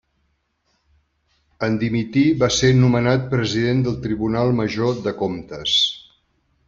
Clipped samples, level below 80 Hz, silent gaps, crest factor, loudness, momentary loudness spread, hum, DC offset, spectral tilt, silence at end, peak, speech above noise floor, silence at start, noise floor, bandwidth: under 0.1%; -46 dBFS; none; 16 dB; -19 LUFS; 9 LU; none; under 0.1%; -5.5 dB/octave; 0.7 s; -4 dBFS; 50 dB; 1.6 s; -68 dBFS; 7.6 kHz